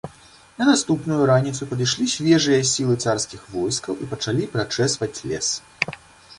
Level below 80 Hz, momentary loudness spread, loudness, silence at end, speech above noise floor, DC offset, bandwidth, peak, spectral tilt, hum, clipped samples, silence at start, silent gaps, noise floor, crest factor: -54 dBFS; 9 LU; -21 LUFS; 0.05 s; 28 dB; under 0.1%; 11.5 kHz; 0 dBFS; -4 dB/octave; none; under 0.1%; 0.05 s; none; -49 dBFS; 20 dB